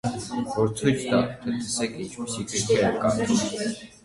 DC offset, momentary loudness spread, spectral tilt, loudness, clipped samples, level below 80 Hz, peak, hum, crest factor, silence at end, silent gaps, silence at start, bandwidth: under 0.1%; 9 LU; -4.5 dB/octave; -25 LUFS; under 0.1%; -54 dBFS; -8 dBFS; none; 18 dB; 0.15 s; none; 0.05 s; 11.5 kHz